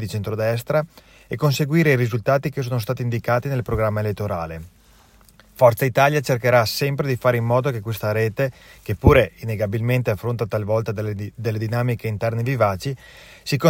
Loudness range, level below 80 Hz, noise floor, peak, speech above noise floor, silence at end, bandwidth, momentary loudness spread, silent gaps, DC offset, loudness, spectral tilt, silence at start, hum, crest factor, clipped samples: 4 LU; -40 dBFS; -52 dBFS; -2 dBFS; 31 dB; 0 s; 16.5 kHz; 10 LU; none; under 0.1%; -21 LUFS; -6.5 dB/octave; 0 s; none; 20 dB; under 0.1%